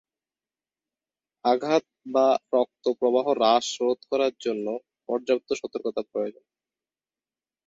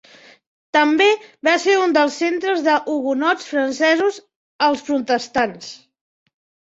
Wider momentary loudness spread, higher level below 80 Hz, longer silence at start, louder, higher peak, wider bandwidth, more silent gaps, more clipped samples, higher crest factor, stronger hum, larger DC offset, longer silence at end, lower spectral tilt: about the same, 9 LU vs 7 LU; second, -72 dBFS vs -64 dBFS; first, 1.45 s vs 0.75 s; second, -25 LUFS vs -18 LUFS; second, -6 dBFS vs -2 dBFS; about the same, 7.8 kHz vs 8 kHz; second, none vs 4.36-4.59 s; neither; about the same, 20 dB vs 16 dB; neither; neither; first, 1.35 s vs 0.9 s; about the same, -3.5 dB/octave vs -2.5 dB/octave